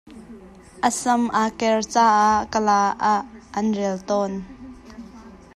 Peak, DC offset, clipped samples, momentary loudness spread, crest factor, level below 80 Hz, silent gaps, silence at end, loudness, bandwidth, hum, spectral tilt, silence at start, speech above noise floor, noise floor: -4 dBFS; under 0.1%; under 0.1%; 23 LU; 18 dB; -52 dBFS; none; 0.2 s; -21 LUFS; 12.5 kHz; none; -4 dB/octave; 0.05 s; 23 dB; -43 dBFS